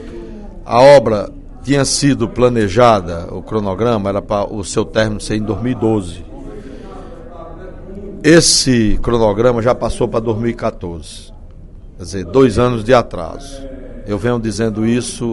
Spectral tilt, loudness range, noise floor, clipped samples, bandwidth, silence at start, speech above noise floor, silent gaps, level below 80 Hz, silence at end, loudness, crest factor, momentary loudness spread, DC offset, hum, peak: -5 dB/octave; 7 LU; -34 dBFS; 0.1%; 12 kHz; 0 s; 20 dB; none; -30 dBFS; 0 s; -14 LUFS; 14 dB; 23 LU; under 0.1%; none; 0 dBFS